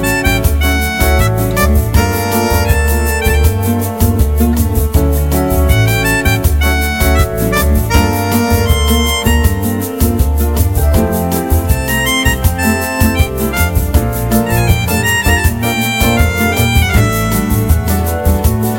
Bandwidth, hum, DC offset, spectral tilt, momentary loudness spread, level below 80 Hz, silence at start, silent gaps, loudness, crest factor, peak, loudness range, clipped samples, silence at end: 17 kHz; none; under 0.1%; -5 dB/octave; 3 LU; -16 dBFS; 0 s; none; -12 LUFS; 12 dB; 0 dBFS; 1 LU; under 0.1%; 0 s